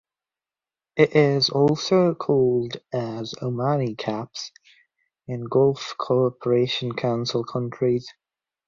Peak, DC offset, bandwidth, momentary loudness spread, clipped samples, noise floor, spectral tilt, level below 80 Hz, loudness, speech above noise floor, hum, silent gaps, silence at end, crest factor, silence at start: -4 dBFS; under 0.1%; 7.4 kHz; 11 LU; under 0.1%; under -90 dBFS; -6 dB/octave; -62 dBFS; -23 LUFS; over 68 dB; none; none; 0.55 s; 20 dB; 0.95 s